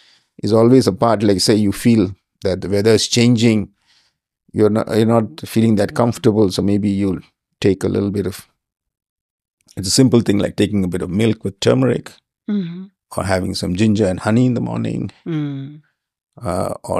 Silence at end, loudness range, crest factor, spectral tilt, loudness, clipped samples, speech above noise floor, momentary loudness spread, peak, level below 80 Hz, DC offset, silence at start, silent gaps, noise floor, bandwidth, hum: 0 s; 4 LU; 16 dB; -6 dB/octave; -17 LUFS; under 0.1%; 45 dB; 13 LU; 0 dBFS; -50 dBFS; under 0.1%; 0.45 s; 9.09-9.39 s, 9.48-9.57 s, 16.23-16.27 s; -61 dBFS; 15 kHz; none